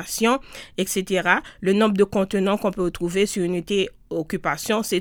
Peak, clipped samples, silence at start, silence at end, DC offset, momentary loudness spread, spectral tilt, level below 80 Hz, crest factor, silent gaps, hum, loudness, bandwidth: -2 dBFS; under 0.1%; 0 s; 0 s; under 0.1%; 7 LU; -4.5 dB/octave; -48 dBFS; 20 dB; none; none; -22 LUFS; 19 kHz